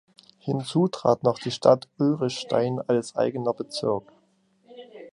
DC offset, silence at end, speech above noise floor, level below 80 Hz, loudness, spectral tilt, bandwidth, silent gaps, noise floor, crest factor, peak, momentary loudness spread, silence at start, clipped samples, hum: under 0.1%; 0.05 s; 41 dB; -68 dBFS; -25 LUFS; -6.5 dB/octave; 11 kHz; none; -65 dBFS; 22 dB; -4 dBFS; 10 LU; 0.45 s; under 0.1%; none